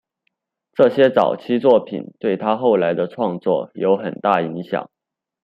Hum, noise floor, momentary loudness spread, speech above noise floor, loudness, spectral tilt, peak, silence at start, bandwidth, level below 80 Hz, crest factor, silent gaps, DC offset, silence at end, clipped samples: none; -73 dBFS; 10 LU; 55 dB; -18 LUFS; -8.5 dB/octave; -2 dBFS; 0.8 s; 5.4 kHz; -66 dBFS; 16 dB; none; under 0.1%; 0.6 s; under 0.1%